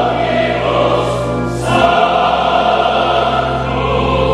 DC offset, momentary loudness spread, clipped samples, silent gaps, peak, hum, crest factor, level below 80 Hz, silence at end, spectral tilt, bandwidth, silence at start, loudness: under 0.1%; 5 LU; under 0.1%; none; 0 dBFS; none; 14 dB; -30 dBFS; 0 s; -5.5 dB/octave; 12 kHz; 0 s; -13 LUFS